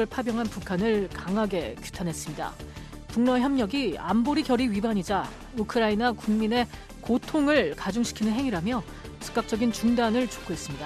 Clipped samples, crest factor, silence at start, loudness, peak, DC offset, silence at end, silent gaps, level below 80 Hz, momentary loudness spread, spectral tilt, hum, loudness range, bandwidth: under 0.1%; 16 dB; 0 s; -27 LUFS; -10 dBFS; under 0.1%; 0 s; none; -46 dBFS; 11 LU; -5 dB/octave; none; 2 LU; 14 kHz